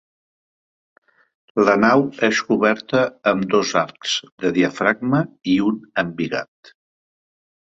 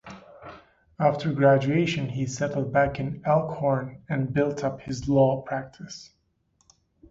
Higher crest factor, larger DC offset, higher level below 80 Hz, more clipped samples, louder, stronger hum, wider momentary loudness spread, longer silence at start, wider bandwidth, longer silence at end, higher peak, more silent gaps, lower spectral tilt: about the same, 18 dB vs 20 dB; neither; second, -60 dBFS vs -54 dBFS; neither; first, -19 LUFS vs -25 LUFS; neither; second, 8 LU vs 20 LU; first, 1.55 s vs 0.05 s; about the same, 8 kHz vs 7.8 kHz; first, 1.35 s vs 1.05 s; first, -2 dBFS vs -6 dBFS; first, 4.32-4.38 s vs none; second, -5 dB/octave vs -7 dB/octave